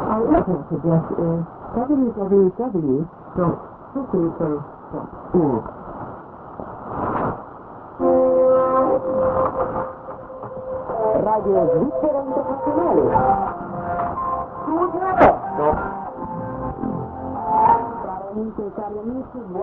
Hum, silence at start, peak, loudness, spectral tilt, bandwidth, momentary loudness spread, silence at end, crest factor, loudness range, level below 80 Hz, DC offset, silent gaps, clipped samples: none; 0 s; 0 dBFS; -21 LUFS; -11.5 dB/octave; 3.8 kHz; 16 LU; 0 s; 20 dB; 5 LU; -44 dBFS; under 0.1%; none; under 0.1%